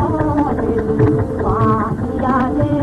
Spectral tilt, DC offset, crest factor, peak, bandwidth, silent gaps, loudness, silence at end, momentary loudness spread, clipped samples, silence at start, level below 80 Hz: -9.5 dB/octave; under 0.1%; 12 dB; -4 dBFS; 10 kHz; none; -17 LUFS; 0 s; 3 LU; under 0.1%; 0 s; -30 dBFS